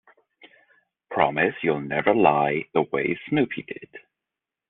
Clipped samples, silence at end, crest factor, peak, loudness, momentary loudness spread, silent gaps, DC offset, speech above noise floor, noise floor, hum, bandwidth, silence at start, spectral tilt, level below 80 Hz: under 0.1%; 0.7 s; 22 dB; -2 dBFS; -23 LUFS; 13 LU; none; under 0.1%; 64 dB; -87 dBFS; none; 4.1 kHz; 0.45 s; -4.5 dB/octave; -62 dBFS